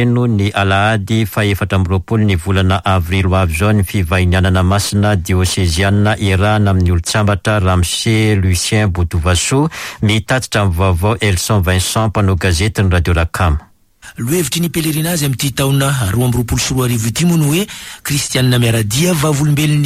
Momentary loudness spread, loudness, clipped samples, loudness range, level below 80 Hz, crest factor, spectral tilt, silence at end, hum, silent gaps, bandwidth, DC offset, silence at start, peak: 3 LU; -14 LUFS; under 0.1%; 2 LU; -28 dBFS; 10 dB; -5 dB/octave; 0 s; none; none; 16 kHz; under 0.1%; 0 s; -2 dBFS